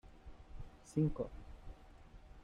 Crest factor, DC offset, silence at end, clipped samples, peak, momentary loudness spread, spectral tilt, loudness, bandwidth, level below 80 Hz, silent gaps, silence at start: 20 dB; under 0.1%; 0 s; under 0.1%; -22 dBFS; 24 LU; -8.5 dB/octave; -40 LUFS; 10.5 kHz; -54 dBFS; none; 0.05 s